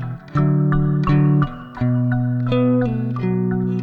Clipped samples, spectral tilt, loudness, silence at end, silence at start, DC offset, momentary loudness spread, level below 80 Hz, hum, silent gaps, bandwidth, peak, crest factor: under 0.1%; -10.5 dB/octave; -19 LUFS; 0 s; 0 s; under 0.1%; 6 LU; -36 dBFS; none; none; 4.8 kHz; -6 dBFS; 12 dB